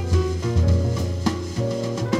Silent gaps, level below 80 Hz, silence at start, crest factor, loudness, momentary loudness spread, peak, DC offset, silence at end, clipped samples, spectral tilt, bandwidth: none; -30 dBFS; 0 s; 14 dB; -23 LUFS; 6 LU; -8 dBFS; under 0.1%; 0 s; under 0.1%; -7 dB/octave; 11 kHz